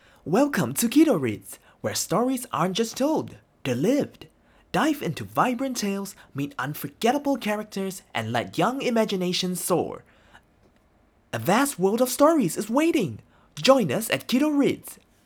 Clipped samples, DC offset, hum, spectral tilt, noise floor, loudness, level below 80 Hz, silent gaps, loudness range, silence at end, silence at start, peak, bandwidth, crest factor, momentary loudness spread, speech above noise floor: under 0.1%; under 0.1%; none; -4.5 dB/octave; -61 dBFS; -24 LUFS; -62 dBFS; none; 5 LU; 0.3 s; 0.25 s; -4 dBFS; over 20 kHz; 22 dB; 14 LU; 37 dB